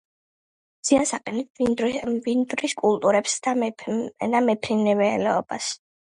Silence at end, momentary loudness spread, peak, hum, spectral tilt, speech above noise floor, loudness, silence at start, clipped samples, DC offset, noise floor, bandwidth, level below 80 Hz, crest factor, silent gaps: 0.3 s; 8 LU; -6 dBFS; none; -4 dB/octave; over 67 dB; -23 LUFS; 0.85 s; under 0.1%; under 0.1%; under -90 dBFS; 11.5 kHz; -60 dBFS; 18 dB; 1.50-1.55 s